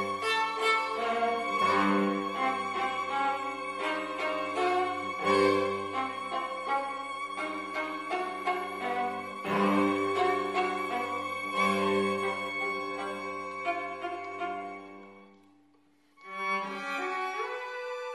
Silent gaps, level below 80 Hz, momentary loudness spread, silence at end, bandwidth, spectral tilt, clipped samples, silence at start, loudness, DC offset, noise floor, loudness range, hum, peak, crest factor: none; -70 dBFS; 10 LU; 0 s; 14 kHz; -4.5 dB/octave; under 0.1%; 0 s; -30 LUFS; under 0.1%; -66 dBFS; 8 LU; none; -12 dBFS; 18 dB